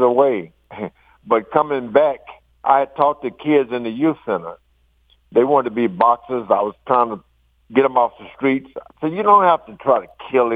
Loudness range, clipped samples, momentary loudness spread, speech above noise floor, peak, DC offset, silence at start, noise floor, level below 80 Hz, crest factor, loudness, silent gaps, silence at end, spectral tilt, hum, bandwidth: 2 LU; under 0.1%; 11 LU; 42 dB; -2 dBFS; under 0.1%; 0 s; -59 dBFS; -60 dBFS; 18 dB; -18 LUFS; none; 0 s; -8.5 dB/octave; none; 4.8 kHz